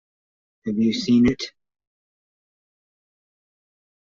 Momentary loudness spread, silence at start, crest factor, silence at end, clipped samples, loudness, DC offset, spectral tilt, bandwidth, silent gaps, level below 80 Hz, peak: 16 LU; 0.65 s; 18 dB; 2.6 s; under 0.1%; -21 LUFS; under 0.1%; -5.5 dB/octave; 7.4 kHz; none; -52 dBFS; -8 dBFS